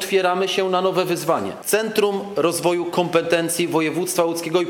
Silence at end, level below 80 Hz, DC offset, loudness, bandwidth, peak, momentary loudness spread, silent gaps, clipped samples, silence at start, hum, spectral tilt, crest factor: 0 s; -66 dBFS; under 0.1%; -20 LUFS; 19.5 kHz; -4 dBFS; 3 LU; none; under 0.1%; 0 s; none; -4 dB/octave; 16 dB